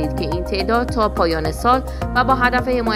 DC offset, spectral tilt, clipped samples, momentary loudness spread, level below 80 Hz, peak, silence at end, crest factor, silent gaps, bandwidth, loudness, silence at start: under 0.1%; -6 dB/octave; under 0.1%; 6 LU; -28 dBFS; -2 dBFS; 0 s; 16 dB; none; 16 kHz; -18 LUFS; 0 s